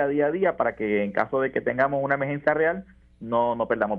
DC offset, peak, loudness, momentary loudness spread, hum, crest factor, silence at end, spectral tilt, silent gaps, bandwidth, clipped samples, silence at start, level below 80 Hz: under 0.1%; -6 dBFS; -24 LUFS; 3 LU; none; 18 dB; 0 s; -9 dB/octave; none; 5.4 kHz; under 0.1%; 0 s; -58 dBFS